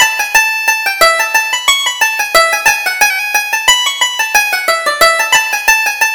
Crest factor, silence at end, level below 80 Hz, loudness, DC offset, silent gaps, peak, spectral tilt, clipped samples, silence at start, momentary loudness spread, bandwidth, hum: 12 dB; 0 s; -44 dBFS; -10 LUFS; 0.1%; none; 0 dBFS; 2 dB/octave; 0.2%; 0 s; 3 LU; over 20 kHz; none